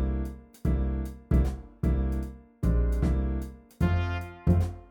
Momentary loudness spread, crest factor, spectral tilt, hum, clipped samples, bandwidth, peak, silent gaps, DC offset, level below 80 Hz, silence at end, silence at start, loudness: 8 LU; 16 dB; -8.5 dB/octave; none; under 0.1%; 10 kHz; -12 dBFS; none; under 0.1%; -30 dBFS; 0.1 s; 0 s; -29 LUFS